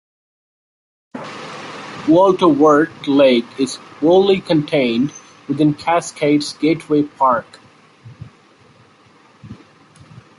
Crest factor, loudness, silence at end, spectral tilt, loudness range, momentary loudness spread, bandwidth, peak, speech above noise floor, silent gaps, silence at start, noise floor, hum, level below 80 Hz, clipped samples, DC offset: 16 dB; -16 LUFS; 0.85 s; -6 dB/octave; 7 LU; 18 LU; 11.5 kHz; -2 dBFS; 35 dB; none; 1.15 s; -49 dBFS; none; -58 dBFS; under 0.1%; under 0.1%